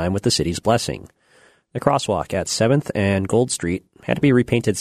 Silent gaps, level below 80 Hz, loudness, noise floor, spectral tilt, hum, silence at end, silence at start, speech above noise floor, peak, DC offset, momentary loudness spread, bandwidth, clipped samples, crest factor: none; -46 dBFS; -20 LUFS; -55 dBFS; -5 dB/octave; none; 0 s; 0 s; 35 dB; -2 dBFS; under 0.1%; 9 LU; 13.5 kHz; under 0.1%; 18 dB